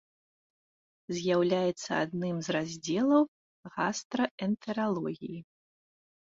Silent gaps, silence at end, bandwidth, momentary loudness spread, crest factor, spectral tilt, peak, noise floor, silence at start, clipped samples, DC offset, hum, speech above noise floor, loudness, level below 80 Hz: 3.28-3.63 s, 4.05-4.10 s, 4.31-4.38 s; 0.95 s; 7.8 kHz; 12 LU; 20 dB; -5.5 dB/octave; -12 dBFS; under -90 dBFS; 1.1 s; under 0.1%; under 0.1%; none; over 60 dB; -31 LUFS; -72 dBFS